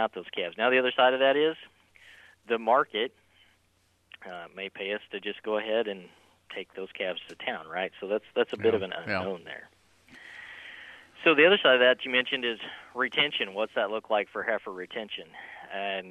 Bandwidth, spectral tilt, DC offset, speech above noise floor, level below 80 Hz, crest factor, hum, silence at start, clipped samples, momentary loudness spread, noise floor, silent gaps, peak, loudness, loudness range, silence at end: 9.2 kHz; -5 dB/octave; under 0.1%; 40 dB; -76 dBFS; 22 dB; none; 0 s; under 0.1%; 21 LU; -68 dBFS; none; -8 dBFS; -27 LUFS; 10 LU; 0 s